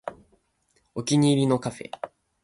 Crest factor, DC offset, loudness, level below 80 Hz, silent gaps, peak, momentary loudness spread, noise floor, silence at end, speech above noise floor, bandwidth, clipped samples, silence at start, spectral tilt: 18 dB; under 0.1%; -23 LUFS; -64 dBFS; none; -10 dBFS; 19 LU; -69 dBFS; 0.35 s; 46 dB; 11.5 kHz; under 0.1%; 0.05 s; -6 dB/octave